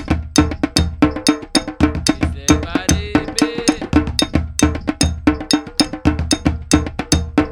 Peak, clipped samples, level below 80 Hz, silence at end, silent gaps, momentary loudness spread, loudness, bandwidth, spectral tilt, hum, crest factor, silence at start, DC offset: 0 dBFS; under 0.1%; -26 dBFS; 0 s; none; 3 LU; -17 LUFS; 17 kHz; -4.5 dB/octave; none; 16 dB; 0 s; under 0.1%